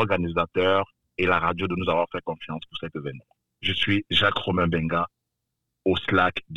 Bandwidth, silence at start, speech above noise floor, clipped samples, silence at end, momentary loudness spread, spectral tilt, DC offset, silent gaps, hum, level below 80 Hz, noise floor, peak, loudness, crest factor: 10.5 kHz; 0 s; 56 dB; under 0.1%; 0 s; 13 LU; -6.5 dB/octave; 0.4%; none; none; -50 dBFS; -81 dBFS; -8 dBFS; -24 LUFS; 18 dB